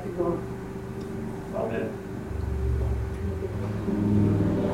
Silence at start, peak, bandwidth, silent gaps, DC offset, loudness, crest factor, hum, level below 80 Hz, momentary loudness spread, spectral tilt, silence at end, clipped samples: 0 s; -12 dBFS; 14.5 kHz; none; under 0.1%; -29 LUFS; 16 dB; none; -36 dBFS; 12 LU; -9 dB/octave; 0 s; under 0.1%